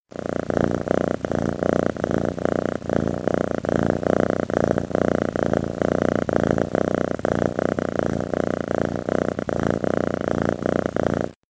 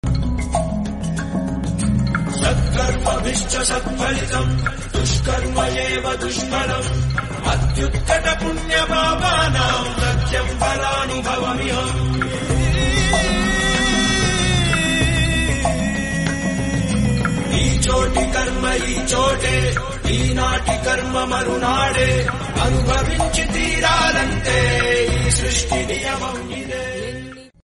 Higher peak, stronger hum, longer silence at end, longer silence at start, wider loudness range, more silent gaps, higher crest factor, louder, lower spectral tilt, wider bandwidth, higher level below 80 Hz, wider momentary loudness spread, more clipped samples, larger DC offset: about the same, -2 dBFS vs -4 dBFS; neither; second, 0.15 s vs 0.3 s; about the same, 0.15 s vs 0.05 s; about the same, 2 LU vs 3 LU; neither; first, 22 dB vs 16 dB; second, -23 LUFS vs -19 LUFS; first, -7.5 dB/octave vs -4 dB/octave; second, 9.4 kHz vs 11.5 kHz; second, -44 dBFS vs -26 dBFS; second, 3 LU vs 6 LU; neither; neither